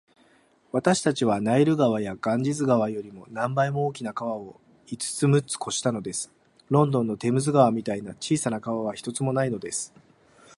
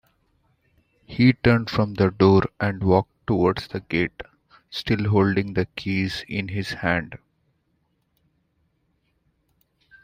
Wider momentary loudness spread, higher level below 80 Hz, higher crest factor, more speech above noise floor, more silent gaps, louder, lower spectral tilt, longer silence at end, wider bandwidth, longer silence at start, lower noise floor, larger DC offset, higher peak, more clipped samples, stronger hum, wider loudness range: about the same, 11 LU vs 12 LU; second, -64 dBFS vs -50 dBFS; about the same, 20 dB vs 20 dB; second, 36 dB vs 49 dB; neither; second, -25 LUFS vs -22 LUFS; second, -5.5 dB/octave vs -7.5 dB/octave; second, 0.7 s vs 2.9 s; second, 11.5 kHz vs 14.5 kHz; second, 0.75 s vs 1.1 s; second, -61 dBFS vs -70 dBFS; neither; about the same, -4 dBFS vs -4 dBFS; neither; neither; second, 3 LU vs 10 LU